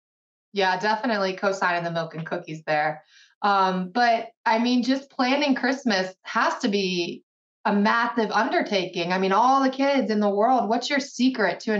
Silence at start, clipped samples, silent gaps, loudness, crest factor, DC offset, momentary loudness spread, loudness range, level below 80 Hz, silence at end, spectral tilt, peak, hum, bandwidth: 0.55 s; under 0.1%; 3.35-3.41 s, 4.37-4.44 s, 7.23-7.64 s; -23 LUFS; 14 dB; under 0.1%; 8 LU; 3 LU; -78 dBFS; 0 s; -5 dB/octave; -8 dBFS; none; 7.8 kHz